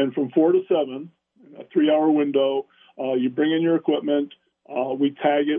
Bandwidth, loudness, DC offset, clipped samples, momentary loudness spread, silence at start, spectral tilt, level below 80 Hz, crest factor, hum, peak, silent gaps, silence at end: 3.7 kHz; -22 LUFS; under 0.1%; under 0.1%; 11 LU; 0 s; -10 dB/octave; -80 dBFS; 14 dB; none; -8 dBFS; none; 0 s